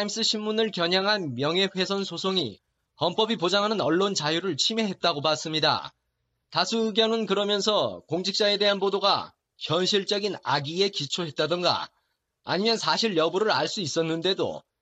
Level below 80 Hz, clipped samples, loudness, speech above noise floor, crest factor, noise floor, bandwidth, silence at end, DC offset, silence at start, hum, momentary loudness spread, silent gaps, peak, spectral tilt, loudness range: -72 dBFS; under 0.1%; -25 LUFS; 52 dB; 18 dB; -77 dBFS; 8.6 kHz; 0.2 s; under 0.1%; 0 s; none; 6 LU; none; -8 dBFS; -3.5 dB/octave; 2 LU